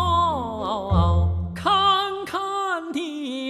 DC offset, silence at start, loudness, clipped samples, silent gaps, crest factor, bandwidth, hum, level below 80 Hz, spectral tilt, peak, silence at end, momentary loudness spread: under 0.1%; 0 s; -23 LUFS; under 0.1%; none; 16 dB; 12 kHz; none; -34 dBFS; -6 dB/octave; -6 dBFS; 0 s; 9 LU